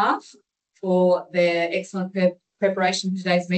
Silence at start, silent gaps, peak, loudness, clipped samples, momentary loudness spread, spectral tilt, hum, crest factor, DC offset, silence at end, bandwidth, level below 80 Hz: 0 s; none; -8 dBFS; -23 LUFS; under 0.1%; 7 LU; -5.5 dB/octave; none; 14 dB; under 0.1%; 0 s; 9 kHz; -74 dBFS